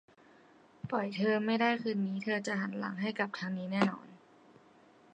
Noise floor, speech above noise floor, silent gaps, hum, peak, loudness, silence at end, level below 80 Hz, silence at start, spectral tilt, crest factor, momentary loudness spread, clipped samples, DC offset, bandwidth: -62 dBFS; 29 dB; none; none; -16 dBFS; -33 LUFS; 0.95 s; -80 dBFS; 0.85 s; -6 dB/octave; 20 dB; 7 LU; under 0.1%; under 0.1%; 8.8 kHz